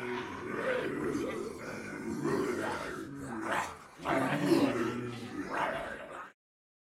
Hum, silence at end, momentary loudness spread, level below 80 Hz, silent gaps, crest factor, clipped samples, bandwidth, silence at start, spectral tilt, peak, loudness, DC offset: none; 0.5 s; 13 LU; -64 dBFS; none; 20 dB; under 0.1%; 16 kHz; 0 s; -5.5 dB/octave; -14 dBFS; -35 LUFS; under 0.1%